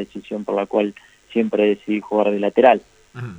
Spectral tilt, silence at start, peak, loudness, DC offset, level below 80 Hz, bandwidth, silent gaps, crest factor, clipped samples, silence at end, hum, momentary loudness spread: -7 dB/octave; 0 s; 0 dBFS; -19 LUFS; under 0.1%; -62 dBFS; 9 kHz; none; 20 dB; under 0.1%; 0 s; none; 12 LU